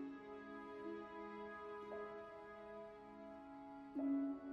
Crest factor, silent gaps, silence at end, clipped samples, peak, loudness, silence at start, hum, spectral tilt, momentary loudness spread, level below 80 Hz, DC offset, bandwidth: 16 dB; none; 0 s; under 0.1%; -34 dBFS; -50 LUFS; 0 s; none; -7.5 dB/octave; 13 LU; -78 dBFS; under 0.1%; 5.8 kHz